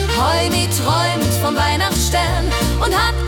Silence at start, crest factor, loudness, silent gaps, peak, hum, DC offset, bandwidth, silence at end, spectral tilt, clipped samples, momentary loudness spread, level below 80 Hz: 0 s; 12 dB; -16 LUFS; none; -4 dBFS; none; under 0.1%; 18 kHz; 0 s; -4 dB/octave; under 0.1%; 2 LU; -24 dBFS